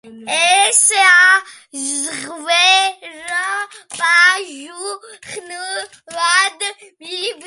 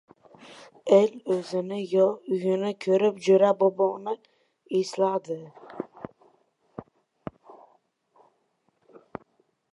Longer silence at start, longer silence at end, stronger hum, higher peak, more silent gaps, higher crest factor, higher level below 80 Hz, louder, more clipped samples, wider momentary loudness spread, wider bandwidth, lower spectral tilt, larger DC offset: second, 0.05 s vs 0.5 s; second, 0 s vs 2.9 s; neither; first, 0 dBFS vs -6 dBFS; neither; about the same, 16 dB vs 20 dB; about the same, -72 dBFS vs -72 dBFS; first, -13 LUFS vs -25 LUFS; neither; second, 20 LU vs 24 LU; about the same, 12 kHz vs 11 kHz; second, 2 dB/octave vs -6.5 dB/octave; neither